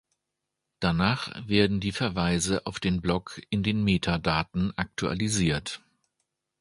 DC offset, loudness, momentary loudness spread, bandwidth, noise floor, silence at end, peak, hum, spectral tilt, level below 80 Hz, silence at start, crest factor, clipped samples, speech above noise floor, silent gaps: under 0.1%; -27 LUFS; 7 LU; 11.5 kHz; -84 dBFS; 0.85 s; -6 dBFS; none; -5 dB/octave; -46 dBFS; 0.8 s; 22 dB; under 0.1%; 57 dB; none